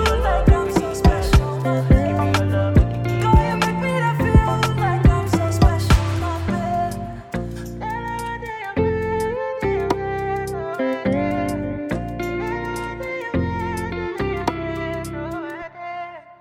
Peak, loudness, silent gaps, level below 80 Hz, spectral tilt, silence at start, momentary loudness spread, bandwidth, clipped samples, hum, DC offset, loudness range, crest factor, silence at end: -4 dBFS; -21 LUFS; none; -26 dBFS; -6.5 dB/octave; 0 s; 12 LU; 16.5 kHz; under 0.1%; none; under 0.1%; 7 LU; 16 dB; 0.05 s